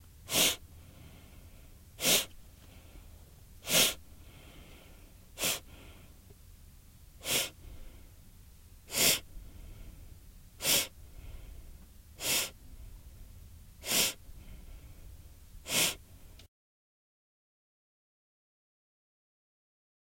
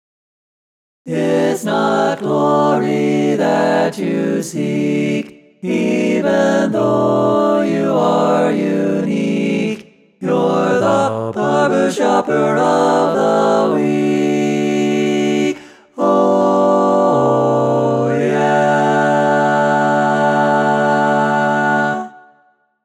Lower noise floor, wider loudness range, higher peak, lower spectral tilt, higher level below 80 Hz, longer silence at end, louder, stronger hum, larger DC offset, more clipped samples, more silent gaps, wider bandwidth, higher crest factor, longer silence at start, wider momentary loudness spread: about the same, -55 dBFS vs -56 dBFS; first, 6 LU vs 3 LU; second, -12 dBFS vs -2 dBFS; second, -0.5 dB/octave vs -6 dB/octave; first, -54 dBFS vs -62 dBFS; first, 3.6 s vs 0.65 s; second, -29 LUFS vs -15 LUFS; neither; neither; neither; neither; first, 16.5 kHz vs 14 kHz; first, 26 dB vs 14 dB; second, 0.2 s vs 1.05 s; first, 27 LU vs 6 LU